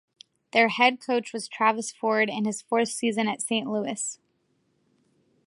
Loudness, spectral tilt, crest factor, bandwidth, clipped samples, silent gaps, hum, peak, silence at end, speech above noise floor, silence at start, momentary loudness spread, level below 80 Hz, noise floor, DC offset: -25 LUFS; -3 dB/octave; 22 dB; 11.5 kHz; under 0.1%; none; none; -6 dBFS; 1.3 s; 45 dB; 0.55 s; 9 LU; -80 dBFS; -71 dBFS; under 0.1%